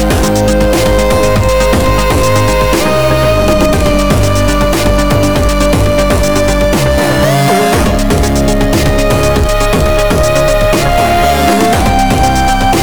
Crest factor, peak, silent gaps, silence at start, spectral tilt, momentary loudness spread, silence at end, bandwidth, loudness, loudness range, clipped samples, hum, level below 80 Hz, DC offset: 8 dB; 0 dBFS; none; 0 s; -5 dB/octave; 1 LU; 0 s; over 20 kHz; -10 LUFS; 1 LU; under 0.1%; none; -16 dBFS; 7%